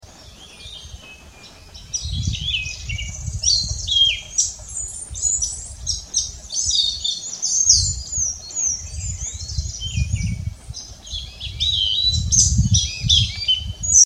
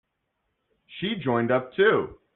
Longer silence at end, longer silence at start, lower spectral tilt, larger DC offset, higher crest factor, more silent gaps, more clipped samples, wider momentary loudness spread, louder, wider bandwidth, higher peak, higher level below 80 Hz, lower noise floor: second, 0 s vs 0.2 s; second, 0.05 s vs 0.9 s; second, -0.5 dB/octave vs -4 dB/octave; neither; about the same, 22 dB vs 18 dB; neither; neither; first, 16 LU vs 11 LU; first, -19 LUFS vs -24 LUFS; first, 14 kHz vs 4.1 kHz; first, 0 dBFS vs -8 dBFS; first, -32 dBFS vs -62 dBFS; second, -43 dBFS vs -78 dBFS